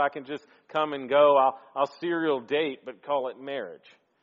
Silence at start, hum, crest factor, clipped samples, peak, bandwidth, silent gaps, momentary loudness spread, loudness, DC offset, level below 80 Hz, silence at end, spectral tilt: 0 s; none; 18 dB; under 0.1%; -10 dBFS; 7 kHz; none; 18 LU; -26 LUFS; under 0.1%; -78 dBFS; 0.5 s; -2.5 dB/octave